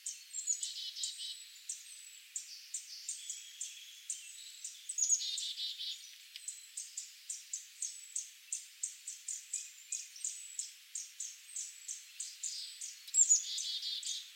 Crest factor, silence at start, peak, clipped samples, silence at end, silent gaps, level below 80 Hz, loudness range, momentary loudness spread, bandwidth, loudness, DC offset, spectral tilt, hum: 24 dB; 0 s; -18 dBFS; under 0.1%; 0 s; none; under -90 dBFS; 9 LU; 14 LU; 16 kHz; -38 LUFS; under 0.1%; 11 dB/octave; none